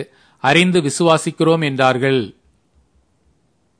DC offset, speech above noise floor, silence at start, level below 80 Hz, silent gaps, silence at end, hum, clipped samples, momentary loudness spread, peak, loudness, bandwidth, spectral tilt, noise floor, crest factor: under 0.1%; 46 dB; 0 s; -60 dBFS; none; 1.5 s; none; under 0.1%; 8 LU; 0 dBFS; -15 LUFS; 10.5 kHz; -5 dB/octave; -62 dBFS; 18 dB